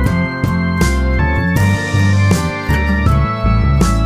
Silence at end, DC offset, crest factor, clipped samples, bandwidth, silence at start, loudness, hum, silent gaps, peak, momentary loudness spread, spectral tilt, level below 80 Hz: 0 s; under 0.1%; 12 dB; under 0.1%; 16 kHz; 0 s; -14 LUFS; none; none; -2 dBFS; 3 LU; -6.5 dB/octave; -18 dBFS